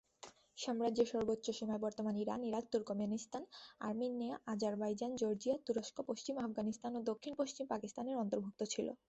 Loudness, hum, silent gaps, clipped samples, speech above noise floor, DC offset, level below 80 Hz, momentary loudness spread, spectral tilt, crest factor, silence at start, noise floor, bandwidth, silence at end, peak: -41 LUFS; none; none; under 0.1%; 21 dB; under 0.1%; -76 dBFS; 6 LU; -5 dB/octave; 18 dB; 0.25 s; -61 dBFS; 8.2 kHz; 0.15 s; -22 dBFS